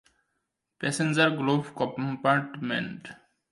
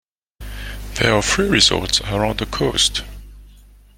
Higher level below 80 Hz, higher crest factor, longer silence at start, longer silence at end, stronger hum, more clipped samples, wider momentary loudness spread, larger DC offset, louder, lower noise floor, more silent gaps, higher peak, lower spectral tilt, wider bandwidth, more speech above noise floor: second, -72 dBFS vs -34 dBFS; about the same, 20 dB vs 20 dB; first, 0.8 s vs 0.4 s; about the same, 0.35 s vs 0.45 s; second, none vs 50 Hz at -30 dBFS; neither; second, 12 LU vs 19 LU; neither; second, -27 LUFS vs -17 LUFS; first, -80 dBFS vs -46 dBFS; neither; second, -8 dBFS vs 0 dBFS; first, -5 dB/octave vs -3 dB/octave; second, 11.5 kHz vs 17 kHz; first, 53 dB vs 28 dB